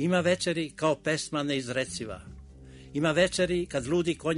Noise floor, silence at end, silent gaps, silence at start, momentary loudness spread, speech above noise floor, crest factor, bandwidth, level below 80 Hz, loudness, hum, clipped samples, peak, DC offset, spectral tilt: -48 dBFS; 0 s; none; 0 s; 12 LU; 20 dB; 18 dB; 11 kHz; -52 dBFS; -28 LUFS; none; under 0.1%; -10 dBFS; under 0.1%; -4.5 dB/octave